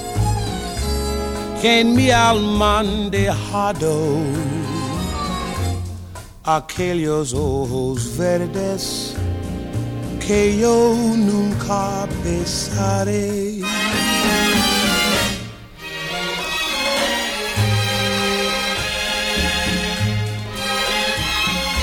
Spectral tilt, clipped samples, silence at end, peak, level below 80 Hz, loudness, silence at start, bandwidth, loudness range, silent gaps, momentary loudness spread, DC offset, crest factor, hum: -4 dB/octave; under 0.1%; 0 s; -2 dBFS; -34 dBFS; -19 LUFS; 0 s; 18 kHz; 5 LU; none; 10 LU; under 0.1%; 16 dB; none